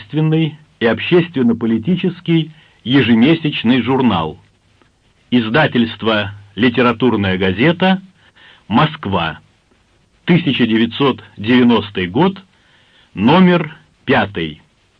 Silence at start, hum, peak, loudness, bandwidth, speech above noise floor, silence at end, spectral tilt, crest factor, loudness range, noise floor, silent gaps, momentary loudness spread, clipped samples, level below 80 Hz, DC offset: 0 s; none; 0 dBFS; -15 LUFS; 5.4 kHz; 41 dB; 0.45 s; -8.5 dB/octave; 16 dB; 3 LU; -55 dBFS; none; 11 LU; under 0.1%; -50 dBFS; under 0.1%